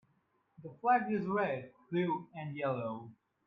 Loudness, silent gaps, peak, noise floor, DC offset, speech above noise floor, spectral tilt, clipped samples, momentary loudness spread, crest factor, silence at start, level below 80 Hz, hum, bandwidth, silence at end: -35 LUFS; none; -18 dBFS; -75 dBFS; under 0.1%; 41 dB; -9.5 dB/octave; under 0.1%; 18 LU; 18 dB; 0.6 s; -76 dBFS; none; 5 kHz; 0.35 s